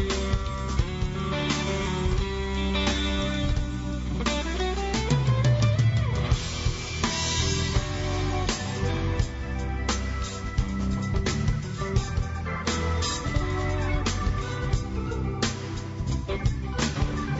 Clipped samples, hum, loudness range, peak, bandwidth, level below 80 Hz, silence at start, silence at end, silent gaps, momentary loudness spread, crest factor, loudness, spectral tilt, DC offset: under 0.1%; none; 4 LU; -10 dBFS; 8 kHz; -32 dBFS; 0 s; 0 s; none; 6 LU; 16 dB; -27 LUFS; -5 dB/octave; under 0.1%